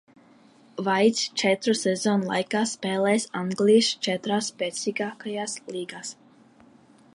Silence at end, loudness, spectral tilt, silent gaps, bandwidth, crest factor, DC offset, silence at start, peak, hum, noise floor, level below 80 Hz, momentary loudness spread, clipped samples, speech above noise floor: 1 s; -25 LUFS; -4 dB/octave; none; 11.5 kHz; 18 dB; under 0.1%; 0.75 s; -8 dBFS; none; -55 dBFS; -74 dBFS; 13 LU; under 0.1%; 30 dB